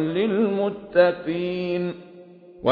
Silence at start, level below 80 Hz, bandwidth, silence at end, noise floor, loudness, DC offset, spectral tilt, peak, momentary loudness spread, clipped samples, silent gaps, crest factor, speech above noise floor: 0 s; -60 dBFS; 5.2 kHz; 0 s; -46 dBFS; -23 LUFS; under 0.1%; -9.5 dB/octave; -4 dBFS; 8 LU; under 0.1%; none; 18 dB; 23 dB